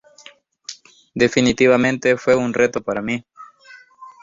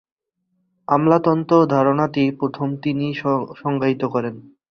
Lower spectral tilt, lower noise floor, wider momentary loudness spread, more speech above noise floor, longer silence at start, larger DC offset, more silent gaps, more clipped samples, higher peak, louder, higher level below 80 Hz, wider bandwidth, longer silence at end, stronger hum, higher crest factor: second, -5 dB/octave vs -8.5 dB/octave; second, -47 dBFS vs -71 dBFS; first, 21 LU vs 8 LU; second, 30 dB vs 52 dB; second, 0.7 s vs 0.9 s; neither; neither; neither; about the same, -2 dBFS vs -2 dBFS; about the same, -18 LUFS vs -19 LUFS; first, -52 dBFS vs -60 dBFS; first, 7.8 kHz vs 6.6 kHz; second, 0.1 s vs 0.3 s; neither; about the same, 18 dB vs 18 dB